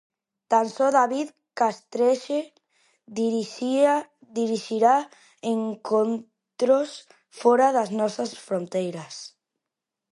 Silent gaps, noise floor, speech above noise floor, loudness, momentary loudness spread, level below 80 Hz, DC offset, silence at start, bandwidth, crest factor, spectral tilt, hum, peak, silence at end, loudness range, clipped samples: none; -86 dBFS; 63 dB; -24 LUFS; 14 LU; -80 dBFS; under 0.1%; 0.5 s; 11.5 kHz; 20 dB; -5 dB/octave; none; -6 dBFS; 0.9 s; 2 LU; under 0.1%